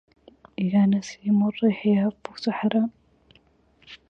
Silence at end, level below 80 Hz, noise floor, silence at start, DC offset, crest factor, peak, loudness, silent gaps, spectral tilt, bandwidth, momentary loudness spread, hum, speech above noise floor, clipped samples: 0.15 s; -62 dBFS; -61 dBFS; 0.6 s; under 0.1%; 16 dB; -10 dBFS; -24 LUFS; none; -7.5 dB/octave; 7.2 kHz; 9 LU; none; 38 dB; under 0.1%